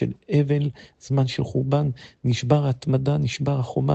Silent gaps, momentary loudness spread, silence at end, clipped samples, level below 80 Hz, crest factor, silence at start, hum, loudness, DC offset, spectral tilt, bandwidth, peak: none; 5 LU; 0 s; under 0.1%; -52 dBFS; 16 dB; 0 s; none; -23 LUFS; under 0.1%; -7.5 dB/octave; 8.2 kHz; -6 dBFS